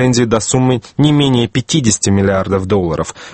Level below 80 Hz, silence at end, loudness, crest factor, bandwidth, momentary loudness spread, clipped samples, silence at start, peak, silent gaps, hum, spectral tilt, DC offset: -38 dBFS; 0 s; -13 LUFS; 14 dB; 9 kHz; 4 LU; under 0.1%; 0 s; 0 dBFS; none; none; -5 dB/octave; under 0.1%